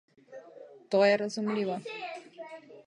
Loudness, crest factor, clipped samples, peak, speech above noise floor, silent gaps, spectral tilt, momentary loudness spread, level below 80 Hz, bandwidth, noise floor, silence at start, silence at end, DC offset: -29 LUFS; 20 dB; under 0.1%; -12 dBFS; 24 dB; none; -5 dB/octave; 25 LU; -86 dBFS; 10.5 kHz; -51 dBFS; 0.3 s; 0.05 s; under 0.1%